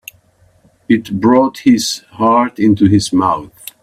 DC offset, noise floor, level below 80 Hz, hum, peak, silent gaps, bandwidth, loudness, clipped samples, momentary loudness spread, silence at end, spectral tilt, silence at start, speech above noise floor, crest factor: under 0.1%; -52 dBFS; -48 dBFS; none; 0 dBFS; none; 15.5 kHz; -13 LUFS; under 0.1%; 6 LU; 0.35 s; -5.5 dB/octave; 0.9 s; 39 dB; 14 dB